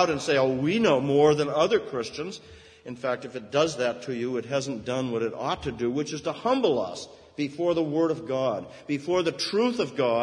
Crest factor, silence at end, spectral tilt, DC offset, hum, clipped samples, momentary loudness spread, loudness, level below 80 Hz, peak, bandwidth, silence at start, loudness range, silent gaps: 18 dB; 0 s; -5 dB/octave; under 0.1%; none; under 0.1%; 11 LU; -26 LUFS; -60 dBFS; -8 dBFS; 10.5 kHz; 0 s; 4 LU; none